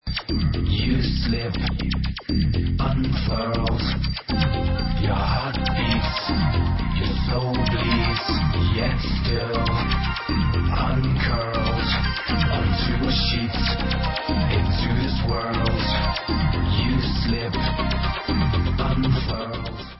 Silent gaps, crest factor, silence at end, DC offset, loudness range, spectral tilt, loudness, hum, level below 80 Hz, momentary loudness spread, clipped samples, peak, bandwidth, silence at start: none; 14 dB; 0 s; under 0.1%; 1 LU; -10 dB/octave; -23 LUFS; none; -26 dBFS; 3 LU; under 0.1%; -8 dBFS; 5.8 kHz; 0.05 s